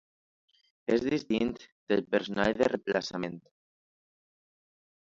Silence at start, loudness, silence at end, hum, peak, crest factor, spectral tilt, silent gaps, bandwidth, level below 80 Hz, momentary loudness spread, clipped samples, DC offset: 0.9 s; -30 LUFS; 1.75 s; none; -12 dBFS; 20 dB; -5.5 dB/octave; 1.72-1.87 s; 7.8 kHz; -62 dBFS; 12 LU; under 0.1%; under 0.1%